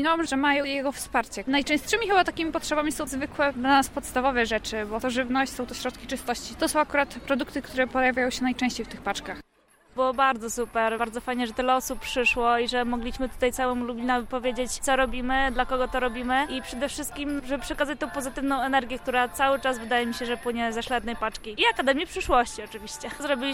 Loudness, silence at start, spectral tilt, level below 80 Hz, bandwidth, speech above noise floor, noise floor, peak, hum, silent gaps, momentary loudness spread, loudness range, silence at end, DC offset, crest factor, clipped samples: -26 LUFS; 0 s; -3 dB/octave; -44 dBFS; 16.5 kHz; 34 dB; -60 dBFS; -8 dBFS; none; none; 8 LU; 3 LU; 0 s; under 0.1%; 18 dB; under 0.1%